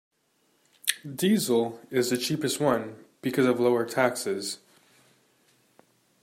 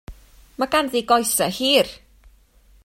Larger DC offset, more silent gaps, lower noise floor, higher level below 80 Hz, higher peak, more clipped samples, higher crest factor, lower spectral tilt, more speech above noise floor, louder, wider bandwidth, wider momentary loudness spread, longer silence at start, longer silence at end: neither; neither; first, -69 dBFS vs -54 dBFS; second, -72 dBFS vs -48 dBFS; about the same, -2 dBFS vs -2 dBFS; neither; first, 26 dB vs 20 dB; first, -4 dB/octave vs -2 dB/octave; first, 44 dB vs 34 dB; second, -27 LUFS vs -19 LUFS; about the same, 16 kHz vs 16.5 kHz; about the same, 9 LU vs 7 LU; first, 0.85 s vs 0.1 s; first, 1.65 s vs 0.9 s